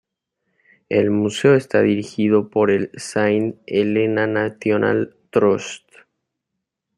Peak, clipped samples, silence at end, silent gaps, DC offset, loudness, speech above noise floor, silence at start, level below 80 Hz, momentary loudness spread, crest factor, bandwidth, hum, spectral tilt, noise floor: -2 dBFS; under 0.1%; 1.2 s; none; under 0.1%; -19 LUFS; 62 dB; 0.9 s; -64 dBFS; 6 LU; 18 dB; 11.5 kHz; none; -6 dB/octave; -80 dBFS